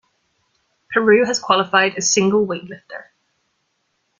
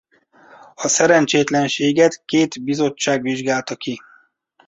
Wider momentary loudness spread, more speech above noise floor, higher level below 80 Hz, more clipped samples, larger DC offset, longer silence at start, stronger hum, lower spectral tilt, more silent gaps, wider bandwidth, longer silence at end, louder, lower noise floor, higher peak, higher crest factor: first, 20 LU vs 13 LU; first, 52 dB vs 40 dB; about the same, -62 dBFS vs -62 dBFS; neither; neither; about the same, 0.9 s vs 0.8 s; neither; about the same, -3 dB/octave vs -3.5 dB/octave; neither; first, 9.6 kHz vs 8.2 kHz; first, 1.2 s vs 0.7 s; about the same, -16 LUFS vs -18 LUFS; first, -69 dBFS vs -57 dBFS; about the same, 0 dBFS vs -2 dBFS; about the same, 20 dB vs 18 dB